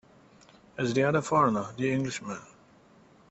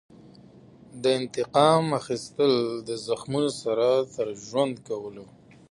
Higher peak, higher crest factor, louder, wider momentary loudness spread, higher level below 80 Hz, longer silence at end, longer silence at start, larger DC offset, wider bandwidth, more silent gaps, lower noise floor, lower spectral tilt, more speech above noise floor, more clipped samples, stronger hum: second, -12 dBFS vs -6 dBFS; about the same, 20 dB vs 20 dB; second, -28 LUFS vs -25 LUFS; first, 16 LU vs 12 LU; about the same, -64 dBFS vs -66 dBFS; first, 0.85 s vs 0.5 s; second, 0.8 s vs 0.95 s; neither; second, 8.2 kHz vs 11.5 kHz; neither; first, -58 dBFS vs -51 dBFS; about the same, -6 dB/octave vs -5.5 dB/octave; first, 31 dB vs 26 dB; neither; neither